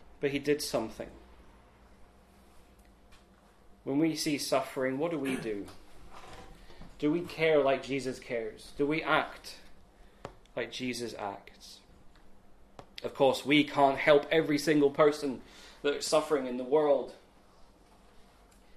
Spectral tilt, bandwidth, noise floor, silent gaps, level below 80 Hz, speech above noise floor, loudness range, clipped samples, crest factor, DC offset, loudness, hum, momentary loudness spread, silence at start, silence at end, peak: -4.5 dB/octave; 14 kHz; -60 dBFS; none; -60 dBFS; 31 dB; 13 LU; under 0.1%; 24 dB; under 0.1%; -30 LUFS; none; 24 LU; 0.2 s; 0.55 s; -8 dBFS